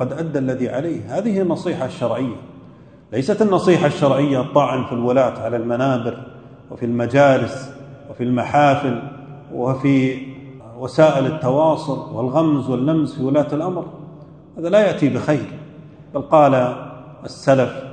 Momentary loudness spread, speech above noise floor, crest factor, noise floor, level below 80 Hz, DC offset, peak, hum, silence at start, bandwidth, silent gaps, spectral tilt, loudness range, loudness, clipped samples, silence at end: 20 LU; 26 dB; 18 dB; -43 dBFS; -56 dBFS; under 0.1%; 0 dBFS; none; 0 s; 9.4 kHz; none; -7.5 dB/octave; 2 LU; -18 LUFS; under 0.1%; 0 s